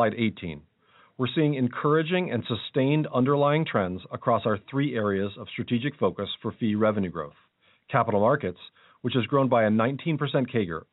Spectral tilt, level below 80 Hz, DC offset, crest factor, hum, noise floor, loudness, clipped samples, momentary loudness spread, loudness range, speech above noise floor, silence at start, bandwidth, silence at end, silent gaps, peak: -5.5 dB/octave; -64 dBFS; under 0.1%; 20 dB; none; -60 dBFS; -26 LUFS; under 0.1%; 10 LU; 3 LU; 35 dB; 0 s; 4.1 kHz; 0.1 s; none; -6 dBFS